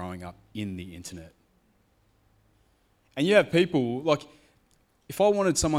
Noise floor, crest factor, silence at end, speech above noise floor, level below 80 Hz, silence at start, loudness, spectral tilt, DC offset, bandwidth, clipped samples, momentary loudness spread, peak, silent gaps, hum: -66 dBFS; 22 dB; 0 s; 41 dB; -54 dBFS; 0 s; -25 LUFS; -4.5 dB/octave; under 0.1%; 16 kHz; under 0.1%; 20 LU; -6 dBFS; none; none